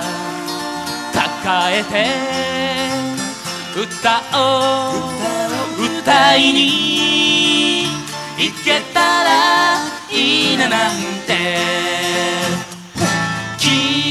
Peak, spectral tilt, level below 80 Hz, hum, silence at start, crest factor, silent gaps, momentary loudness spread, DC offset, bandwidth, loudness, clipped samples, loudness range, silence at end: -2 dBFS; -2.5 dB/octave; -52 dBFS; none; 0 s; 16 dB; none; 11 LU; under 0.1%; 15.5 kHz; -15 LUFS; under 0.1%; 5 LU; 0 s